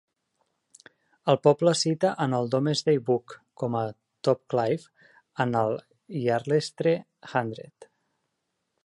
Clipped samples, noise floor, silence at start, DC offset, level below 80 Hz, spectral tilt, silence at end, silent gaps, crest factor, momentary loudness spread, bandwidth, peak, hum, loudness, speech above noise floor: under 0.1%; -80 dBFS; 1.25 s; under 0.1%; -72 dBFS; -5.5 dB/octave; 1 s; none; 20 dB; 11 LU; 11.5 kHz; -6 dBFS; none; -26 LUFS; 54 dB